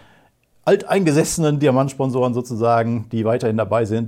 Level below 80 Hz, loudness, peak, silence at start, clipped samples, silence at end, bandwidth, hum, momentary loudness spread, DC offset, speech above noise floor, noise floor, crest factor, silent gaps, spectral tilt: -52 dBFS; -19 LUFS; -4 dBFS; 0.65 s; under 0.1%; 0 s; 16.5 kHz; none; 5 LU; under 0.1%; 39 dB; -56 dBFS; 14 dB; none; -6 dB/octave